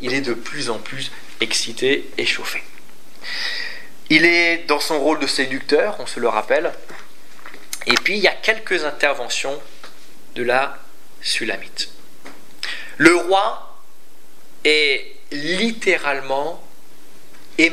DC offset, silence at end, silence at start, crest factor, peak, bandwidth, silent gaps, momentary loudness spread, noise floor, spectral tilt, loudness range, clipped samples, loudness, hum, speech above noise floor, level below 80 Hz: 5%; 0 s; 0 s; 22 dB; 0 dBFS; 16 kHz; none; 16 LU; -52 dBFS; -2.5 dB/octave; 5 LU; under 0.1%; -19 LUFS; none; 32 dB; -64 dBFS